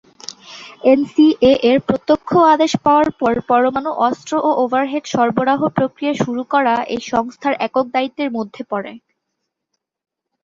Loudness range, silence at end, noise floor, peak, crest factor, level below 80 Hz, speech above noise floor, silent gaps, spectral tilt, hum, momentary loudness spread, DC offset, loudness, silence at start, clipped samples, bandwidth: 7 LU; 1.45 s; -76 dBFS; -2 dBFS; 16 dB; -54 dBFS; 60 dB; none; -5.5 dB/octave; none; 12 LU; under 0.1%; -16 LUFS; 0.3 s; under 0.1%; 7.6 kHz